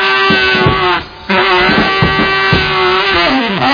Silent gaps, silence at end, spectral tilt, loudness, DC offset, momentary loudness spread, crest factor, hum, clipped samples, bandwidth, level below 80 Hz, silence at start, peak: none; 0 s; -5.5 dB/octave; -10 LUFS; under 0.1%; 4 LU; 10 dB; none; under 0.1%; 5.2 kHz; -30 dBFS; 0 s; 0 dBFS